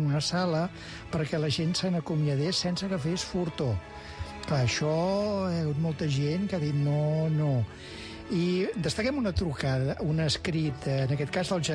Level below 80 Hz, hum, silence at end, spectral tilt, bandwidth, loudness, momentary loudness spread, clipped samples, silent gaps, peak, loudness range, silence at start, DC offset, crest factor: -48 dBFS; none; 0 s; -6 dB/octave; 10.5 kHz; -29 LUFS; 7 LU; under 0.1%; none; -16 dBFS; 1 LU; 0 s; under 0.1%; 12 dB